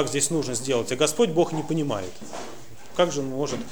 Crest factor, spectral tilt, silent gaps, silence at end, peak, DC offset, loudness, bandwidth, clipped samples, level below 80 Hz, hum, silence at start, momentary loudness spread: 18 dB; -4 dB/octave; none; 0 s; -8 dBFS; 1%; -25 LUFS; over 20 kHz; under 0.1%; -58 dBFS; none; 0 s; 16 LU